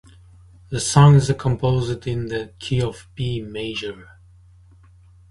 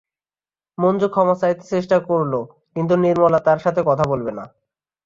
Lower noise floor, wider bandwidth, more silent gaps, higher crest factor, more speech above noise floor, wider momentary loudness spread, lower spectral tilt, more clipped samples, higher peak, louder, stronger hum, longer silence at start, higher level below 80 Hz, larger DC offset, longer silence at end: second, -49 dBFS vs under -90 dBFS; first, 11.5 kHz vs 7.6 kHz; neither; about the same, 20 dB vs 16 dB; second, 30 dB vs over 72 dB; first, 16 LU vs 11 LU; second, -6 dB/octave vs -8 dB/octave; neither; about the same, 0 dBFS vs -2 dBFS; about the same, -20 LUFS vs -19 LUFS; neither; about the same, 0.7 s vs 0.8 s; first, -44 dBFS vs -56 dBFS; neither; first, 1.25 s vs 0.6 s